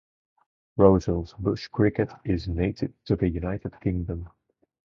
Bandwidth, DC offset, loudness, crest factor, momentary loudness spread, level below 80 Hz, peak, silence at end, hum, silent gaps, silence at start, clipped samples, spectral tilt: 7 kHz; under 0.1%; -26 LUFS; 24 dB; 14 LU; -40 dBFS; -2 dBFS; 0.55 s; none; none; 0.75 s; under 0.1%; -8.5 dB/octave